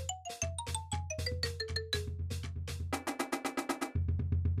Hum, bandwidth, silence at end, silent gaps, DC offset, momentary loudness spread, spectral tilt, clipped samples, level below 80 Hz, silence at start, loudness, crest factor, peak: none; 15 kHz; 0 s; none; under 0.1%; 6 LU; -4 dB/octave; under 0.1%; -46 dBFS; 0 s; -37 LUFS; 16 dB; -22 dBFS